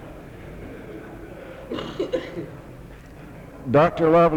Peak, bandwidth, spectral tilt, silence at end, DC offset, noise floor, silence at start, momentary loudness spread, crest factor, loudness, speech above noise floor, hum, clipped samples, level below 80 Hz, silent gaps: -6 dBFS; 15 kHz; -8 dB/octave; 0 s; under 0.1%; -41 dBFS; 0 s; 24 LU; 18 dB; -22 LUFS; 21 dB; none; under 0.1%; -46 dBFS; none